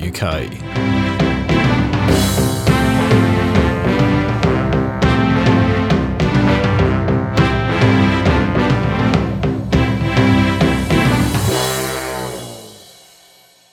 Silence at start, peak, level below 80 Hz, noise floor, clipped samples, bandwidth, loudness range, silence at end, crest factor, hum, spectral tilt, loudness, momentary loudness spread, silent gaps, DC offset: 0 s; 0 dBFS; -28 dBFS; -48 dBFS; under 0.1%; 17.5 kHz; 2 LU; 0.95 s; 14 dB; none; -6 dB/octave; -15 LUFS; 7 LU; none; under 0.1%